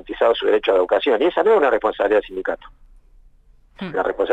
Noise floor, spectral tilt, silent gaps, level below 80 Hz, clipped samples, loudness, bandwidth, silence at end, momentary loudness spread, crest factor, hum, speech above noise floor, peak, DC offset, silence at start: -51 dBFS; -6 dB/octave; none; -48 dBFS; under 0.1%; -18 LUFS; 7.8 kHz; 0 s; 12 LU; 14 dB; none; 33 dB; -6 dBFS; under 0.1%; 0.05 s